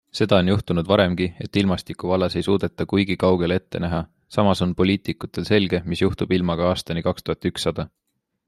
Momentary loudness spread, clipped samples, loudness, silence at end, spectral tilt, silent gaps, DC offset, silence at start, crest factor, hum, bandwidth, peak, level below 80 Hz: 7 LU; under 0.1%; -22 LUFS; 0.6 s; -6.5 dB/octave; none; under 0.1%; 0.15 s; 20 dB; none; 13 kHz; -2 dBFS; -48 dBFS